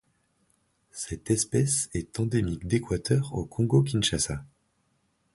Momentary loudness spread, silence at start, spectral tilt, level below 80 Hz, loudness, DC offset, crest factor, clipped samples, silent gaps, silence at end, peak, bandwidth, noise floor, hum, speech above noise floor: 12 LU; 0.95 s; -5 dB/octave; -48 dBFS; -27 LUFS; under 0.1%; 20 dB; under 0.1%; none; 0.9 s; -8 dBFS; 11.5 kHz; -72 dBFS; none; 45 dB